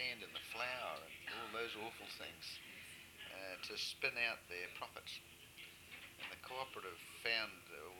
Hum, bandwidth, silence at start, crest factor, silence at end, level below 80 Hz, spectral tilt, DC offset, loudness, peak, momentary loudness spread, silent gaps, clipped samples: none; 19 kHz; 0 s; 24 dB; 0 s; -78 dBFS; -1.5 dB/octave; under 0.1%; -45 LUFS; -24 dBFS; 14 LU; none; under 0.1%